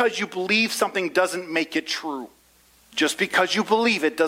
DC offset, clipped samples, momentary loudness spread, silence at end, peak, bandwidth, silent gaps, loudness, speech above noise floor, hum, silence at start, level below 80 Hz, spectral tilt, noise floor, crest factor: under 0.1%; under 0.1%; 10 LU; 0 s; -4 dBFS; 16 kHz; none; -22 LUFS; 34 dB; none; 0 s; -68 dBFS; -3 dB/octave; -57 dBFS; 18 dB